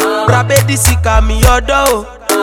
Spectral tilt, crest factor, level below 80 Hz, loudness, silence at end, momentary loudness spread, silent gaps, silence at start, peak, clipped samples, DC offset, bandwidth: -4 dB/octave; 10 dB; -16 dBFS; -11 LUFS; 0 s; 4 LU; none; 0 s; 0 dBFS; 0.9%; under 0.1%; over 20 kHz